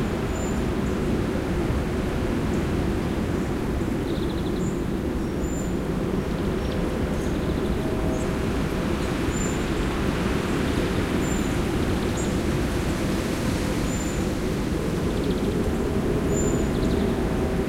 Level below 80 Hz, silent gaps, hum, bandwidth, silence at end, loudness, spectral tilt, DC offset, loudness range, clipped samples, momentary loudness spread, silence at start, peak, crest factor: -32 dBFS; none; none; 16 kHz; 0 s; -25 LUFS; -6 dB/octave; under 0.1%; 2 LU; under 0.1%; 3 LU; 0 s; -10 dBFS; 14 dB